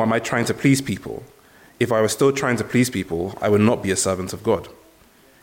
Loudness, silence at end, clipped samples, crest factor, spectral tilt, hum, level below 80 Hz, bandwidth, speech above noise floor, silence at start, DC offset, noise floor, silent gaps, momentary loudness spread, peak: -21 LUFS; 0.7 s; under 0.1%; 16 dB; -5 dB/octave; none; -54 dBFS; 17 kHz; 32 dB; 0 s; under 0.1%; -53 dBFS; none; 9 LU; -4 dBFS